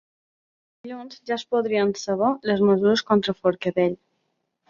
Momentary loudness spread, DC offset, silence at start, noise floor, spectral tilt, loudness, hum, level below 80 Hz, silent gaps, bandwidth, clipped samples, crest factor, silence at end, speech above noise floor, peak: 18 LU; under 0.1%; 0.85 s; -75 dBFS; -5.5 dB/octave; -22 LUFS; none; -66 dBFS; none; 7.4 kHz; under 0.1%; 16 dB; 0.75 s; 53 dB; -8 dBFS